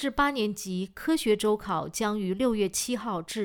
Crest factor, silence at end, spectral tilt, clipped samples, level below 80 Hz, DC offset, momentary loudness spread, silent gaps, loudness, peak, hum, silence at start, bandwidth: 16 dB; 0 s; -4 dB/octave; under 0.1%; -52 dBFS; under 0.1%; 7 LU; none; -28 LUFS; -12 dBFS; none; 0 s; over 20 kHz